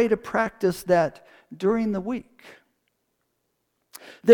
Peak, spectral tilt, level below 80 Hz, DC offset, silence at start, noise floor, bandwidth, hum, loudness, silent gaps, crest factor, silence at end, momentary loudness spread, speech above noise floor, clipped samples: -2 dBFS; -6.5 dB/octave; -58 dBFS; under 0.1%; 0 s; -75 dBFS; 19 kHz; none; -25 LUFS; none; 22 dB; 0 s; 11 LU; 53 dB; under 0.1%